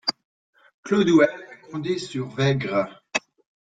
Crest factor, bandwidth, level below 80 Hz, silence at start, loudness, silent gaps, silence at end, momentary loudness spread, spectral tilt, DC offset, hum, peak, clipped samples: 20 dB; 9.2 kHz; -62 dBFS; 0.05 s; -23 LUFS; 0.24-0.53 s, 0.74-0.83 s; 0.45 s; 15 LU; -5.5 dB/octave; under 0.1%; none; -4 dBFS; under 0.1%